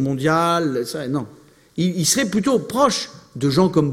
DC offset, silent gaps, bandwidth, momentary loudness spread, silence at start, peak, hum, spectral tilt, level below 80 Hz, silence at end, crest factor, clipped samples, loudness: under 0.1%; none; 16.5 kHz; 9 LU; 0 s; -4 dBFS; none; -4.5 dB/octave; -54 dBFS; 0 s; 16 dB; under 0.1%; -19 LUFS